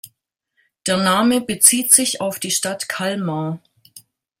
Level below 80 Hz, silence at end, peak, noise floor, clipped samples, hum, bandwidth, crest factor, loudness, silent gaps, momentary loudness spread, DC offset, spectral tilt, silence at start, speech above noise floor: -62 dBFS; 0.4 s; 0 dBFS; -70 dBFS; under 0.1%; none; 16.5 kHz; 20 dB; -16 LUFS; none; 13 LU; under 0.1%; -2.5 dB/octave; 0.05 s; 52 dB